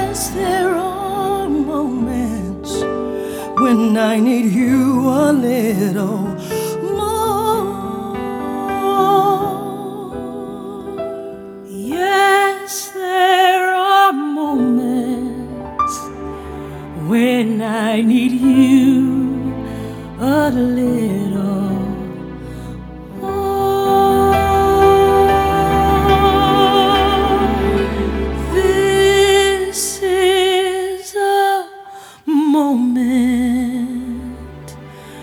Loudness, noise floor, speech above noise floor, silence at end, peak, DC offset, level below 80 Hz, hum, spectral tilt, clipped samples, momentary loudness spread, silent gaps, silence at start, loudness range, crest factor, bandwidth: -15 LUFS; -36 dBFS; 22 dB; 0 s; 0 dBFS; under 0.1%; -34 dBFS; none; -5 dB/octave; under 0.1%; 16 LU; none; 0 s; 6 LU; 16 dB; 19.5 kHz